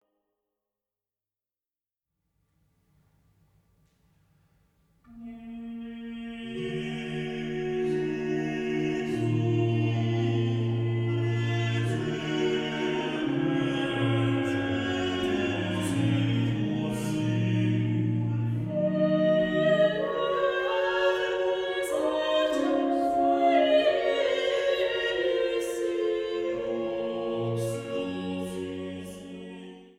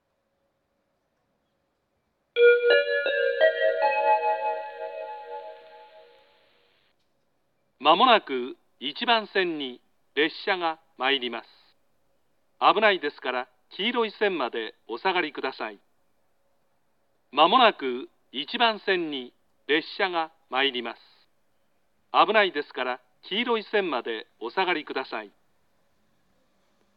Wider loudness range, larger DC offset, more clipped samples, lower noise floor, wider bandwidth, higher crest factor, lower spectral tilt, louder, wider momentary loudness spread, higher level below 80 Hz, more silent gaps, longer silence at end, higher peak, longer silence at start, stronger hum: about the same, 8 LU vs 6 LU; neither; neither; first, under -90 dBFS vs -74 dBFS; first, 13 kHz vs 5.6 kHz; second, 16 dB vs 22 dB; about the same, -6.5 dB/octave vs -5.5 dB/octave; about the same, -27 LUFS vs -25 LUFS; second, 11 LU vs 17 LU; first, -60 dBFS vs -86 dBFS; neither; second, 0.1 s vs 1.7 s; second, -12 dBFS vs -4 dBFS; first, 5.1 s vs 2.35 s; neither